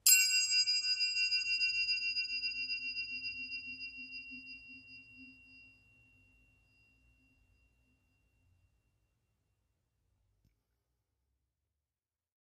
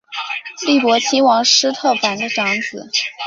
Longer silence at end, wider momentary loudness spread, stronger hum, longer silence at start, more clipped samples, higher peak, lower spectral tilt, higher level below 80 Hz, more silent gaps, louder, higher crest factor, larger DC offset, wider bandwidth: first, 6.8 s vs 0 s; first, 21 LU vs 10 LU; neither; about the same, 0.05 s vs 0.1 s; neither; second, -10 dBFS vs 0 dBFS; second, 3.5 dB/octave vs -1.5 dB/octave; second, -74 dBFS vs -66 dBFS; neither; second, -31 LUFS vs -15 LUFS; first, 28 dB vs 16 dB; neither; first, 14.5 kHz vs 7.8 kHz